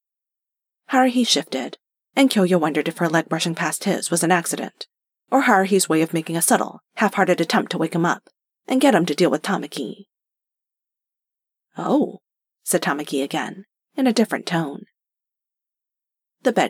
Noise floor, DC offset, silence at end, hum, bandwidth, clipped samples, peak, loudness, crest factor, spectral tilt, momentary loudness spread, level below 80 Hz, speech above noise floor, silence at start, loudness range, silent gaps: -87 dBFS; under 0.1%; 0 s; none; 17 kHz; under 0.1%; 0 dBFS; -20 LUFS; 22 dB; -4 dB/octave; 13 LU; -84 dBFS; 67 dB; 0.9 s; 6 LU; none